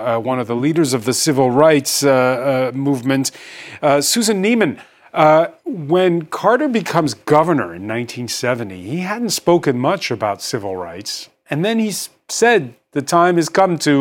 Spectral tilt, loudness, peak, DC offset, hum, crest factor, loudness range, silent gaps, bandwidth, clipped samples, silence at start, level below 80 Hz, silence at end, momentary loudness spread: -4.5 dB/octave; -17 LUFS; 0 dBFS; under 0.1%; none; 16 dB; 4 LU; none; 17 kHz; under 0.1%; 0 s; -62 dBFS; 0 s; 12 LU